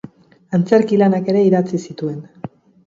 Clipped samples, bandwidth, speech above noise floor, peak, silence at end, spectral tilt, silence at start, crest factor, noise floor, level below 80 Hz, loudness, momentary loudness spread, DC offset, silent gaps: under 0.1%; 7.6 kHz; 25 dB; 0 dBFS; 0.4 s; -8 dB/octave; 0.5 s; 18 dB; -40 dBFS; -62 dBFS; -16 LUFS; 19 LU; under 0.1%; none